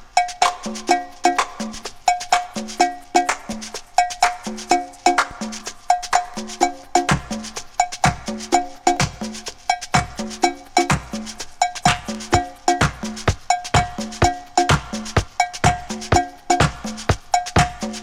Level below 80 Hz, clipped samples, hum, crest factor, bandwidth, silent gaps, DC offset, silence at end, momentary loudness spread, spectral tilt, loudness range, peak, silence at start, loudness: -36 dBFS; under 0.1%; none; 20 dB; 16.5 kHz; none; under 0.1%; 0 s; 10 LU; -4 dB/octave; 2 LU; 0 dBFS; 0 s; -21 LUFS